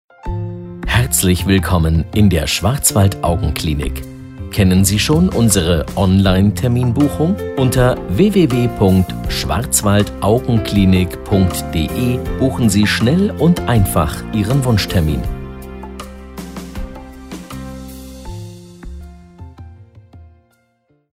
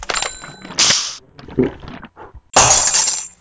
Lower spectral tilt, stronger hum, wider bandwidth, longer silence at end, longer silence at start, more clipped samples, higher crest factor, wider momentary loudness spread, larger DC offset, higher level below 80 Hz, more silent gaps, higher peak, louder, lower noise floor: first, -5.5 dB/octave vs -1 dB/octave; neither; first, 16 kHz vs 8 kHz; first, 0.9 s vs 0.1 s; first, 0.25 s vs 0 s; neither; about the same, 16 dB vs 18 dB; about the same, 19 LU vs 19 LU; neither; first, -28 dBFS vs -40 dBFS; neither; about the same, 0 dBFS vs 0 dBFS; about the same, -15 LUFS vs -14 LUFS; first, -60 dBFS vs -39 dBFS